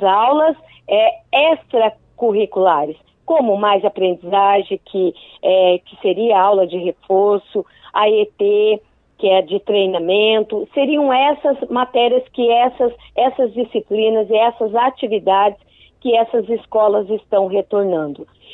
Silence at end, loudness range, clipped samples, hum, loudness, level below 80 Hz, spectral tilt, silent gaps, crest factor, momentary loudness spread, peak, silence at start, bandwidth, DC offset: 0.3 s; 1 LU; under 0.1%; none; -16 LUFS; -58 dBFS; -8 dB/octave; none; 16 dB; 7 LU; 0 dBFS; 0 s; 4.1 kHz; under 0.1%